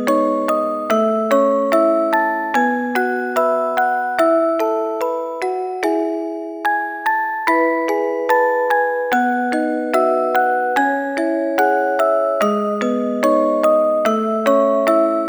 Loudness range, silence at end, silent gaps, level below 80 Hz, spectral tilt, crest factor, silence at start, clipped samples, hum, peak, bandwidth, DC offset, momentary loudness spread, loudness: 3 LU; 0 s; none; -70 dBFS; -5 dB/octave; 16 dB; 0 s; under 0.1%; none; -2 dBFS; over 20 kHz; under 0.1%; 5 LU; -17 LUFS